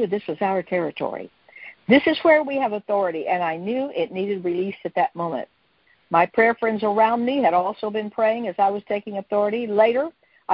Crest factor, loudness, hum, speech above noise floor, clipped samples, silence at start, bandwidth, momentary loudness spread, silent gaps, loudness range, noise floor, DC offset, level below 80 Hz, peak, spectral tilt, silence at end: 18 dB; -22 LUFS; none; 40 dB; under 0.1%; 0 s; 5.6 kHz; 12 LU; none; 4 LU; -62 dBFS; under 0.1%; -64 dBFS; -4 dBFS; -10 dB/octave; 0 s